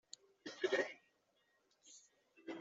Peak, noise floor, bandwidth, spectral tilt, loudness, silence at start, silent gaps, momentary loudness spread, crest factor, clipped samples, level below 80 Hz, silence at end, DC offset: -24 dBFS; -79 dBFS; 8 kHz; -1 dB/octave; -42 LUFS; 0.45 s; none; 23 LU; 22 dB; under 0.1%; under -90 dBFS; 0 s; under 0.1%